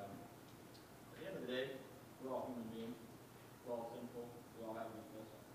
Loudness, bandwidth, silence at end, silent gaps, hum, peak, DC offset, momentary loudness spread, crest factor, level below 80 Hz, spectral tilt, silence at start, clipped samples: -50 LUFS; 15.5 kHz; 0 s; none; none; -30 dBFS; under 0.1%; 14 LU; 20 dB; -78 dBFS; -5.5 dB/octave; 0 s; under 0.1%